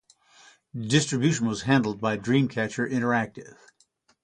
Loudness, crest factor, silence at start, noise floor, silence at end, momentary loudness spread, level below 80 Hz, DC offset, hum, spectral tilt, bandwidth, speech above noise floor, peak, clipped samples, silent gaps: -25 LUFS; 22 dB; 0.75 s; -66 dBFS; 0.75 s; 12 LU; -60 dBFS; under 0.1%; none; -5 dB/octave; 10.5 kHz; 41 dB; -6 dBFS; under 0.1%; none